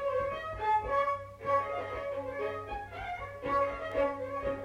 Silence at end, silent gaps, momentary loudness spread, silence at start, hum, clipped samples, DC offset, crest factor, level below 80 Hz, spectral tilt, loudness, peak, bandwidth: 0 s; none; 9 LU; 0 s; none; under 0.1%; under 0.1%; 16 dB; -52 dBFS; -6 dB/octave; -33 LUFS; -18 dBFS; 11 kHz